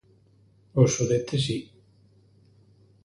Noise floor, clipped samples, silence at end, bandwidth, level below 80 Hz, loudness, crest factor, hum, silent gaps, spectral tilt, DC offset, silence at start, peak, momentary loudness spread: -59 dBFS; under 0.1%; 1.4 s; 11.5 kHz; -58 dBFS; -25 LUFS; 22 dB; none; none; -5.5 dB/octave; under 0.1%; 0.75 s; -6 dBFS; 9 LU